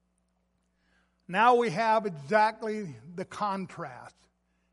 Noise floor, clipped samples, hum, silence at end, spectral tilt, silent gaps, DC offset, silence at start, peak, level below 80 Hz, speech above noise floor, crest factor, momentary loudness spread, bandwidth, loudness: -74 dBFS; under 0.1%; none; 0.65 s; -5.5 dB/octave; none; under 0.1%; 1.3 s; -10 dBFS; -72 dBFS; 46 dB; 20 dB; 18 LU; 11.5 kHz; -27 LUFS